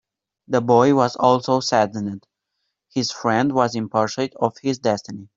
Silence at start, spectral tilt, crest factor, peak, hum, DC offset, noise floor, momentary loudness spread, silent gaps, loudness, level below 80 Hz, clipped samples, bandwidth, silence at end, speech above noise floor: 0.5 s; -5.5 dB/octave; 18 dB; -2 dBFS; none; under 0.1%; -77 dBFS; 10 LU; none; -20 LUFS; -62 dBFS; under 0.1%; 7.8 kHz; 0.1 s; 57 dB